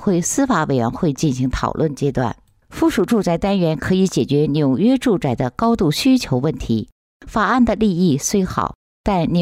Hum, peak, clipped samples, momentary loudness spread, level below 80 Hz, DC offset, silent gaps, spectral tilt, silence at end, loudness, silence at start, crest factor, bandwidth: none; -6 dBFS; under 0.1%; 7 LU; -38 dBFS; under 0.1%; 6.92-7.20 s, 8.75-9.04 s; -5.5 dB/octave; 0 s; -18 LUFS; 0 s; 12 dB; 16 kHz